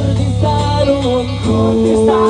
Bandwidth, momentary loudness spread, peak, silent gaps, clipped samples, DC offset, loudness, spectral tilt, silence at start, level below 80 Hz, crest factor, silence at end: 10 kHz; 4 LU; 0 dBFS; none; under 0.1%; under 0.1%; -14 LUFS; -7 dB/octave; 0 s; -28 dBFS; 12 dB; 0 s